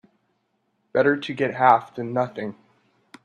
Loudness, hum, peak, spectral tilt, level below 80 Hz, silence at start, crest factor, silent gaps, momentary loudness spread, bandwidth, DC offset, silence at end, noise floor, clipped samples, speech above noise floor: -22 LUFS; none; -2 dBFS; -7 dB/octave; -70 dBFS; 0.95 s; 22 dB; none; 12 LU; 9.4 kHz; under 0.1%; 0.7 s; -71 dBFS; under 0.1%; 50 dB